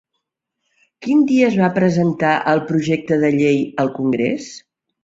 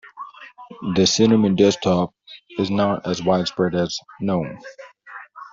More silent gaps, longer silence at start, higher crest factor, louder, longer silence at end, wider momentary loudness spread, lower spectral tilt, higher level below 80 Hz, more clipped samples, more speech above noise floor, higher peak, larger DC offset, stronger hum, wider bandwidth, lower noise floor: neither; first, 1 s vs 0.05 s; about the same, 16 dB vs 18 dB; first, -17 LUFS vs -20 LUFS; first, 0.45 s vs 0.05 s; second, 7 LU vs 23 LU; first, -7 dB/octave vs -5 dB/octave; about the same, -58 dBFS vs -56 dBFS; neither; first, 60 dB vs 22 dB; about the same, -2 dBFS vs -4 dBFS; neither; neither; about the same, 7.8 kHz vs 7.8 kHz; first, -76 dBFS vs -41 dBFS